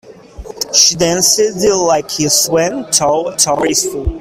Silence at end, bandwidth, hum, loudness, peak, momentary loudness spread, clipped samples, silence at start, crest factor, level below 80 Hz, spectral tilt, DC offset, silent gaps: 0 s; over 20 kHz; none; -12 LUFS; 0 dBFS; 6 LU; under 0.1%; 0.05 s; 14 dB; -34 dBFS; -2 dB/octave; under 0.1%; none